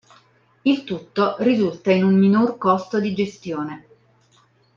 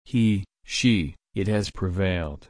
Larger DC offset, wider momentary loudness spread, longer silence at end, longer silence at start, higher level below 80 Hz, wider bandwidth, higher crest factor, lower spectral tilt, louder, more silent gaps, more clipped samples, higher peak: neither; first, 13 LU vs 8 LU; first, 1 s vs 0.15 s; first, 0.65 s vs 0.1 s; second, -64 dBFS vs -42 dBFS; second, 7.2 kHz vs 10.5 kHz; about the same, 16 dB vs 16 dB; first, -7.5 dB/octave vs -5.5 dB/octave; first, -20 LUFS vs -25 LUFS; neither; neither; first, -4 dBFS vs -8 dBFS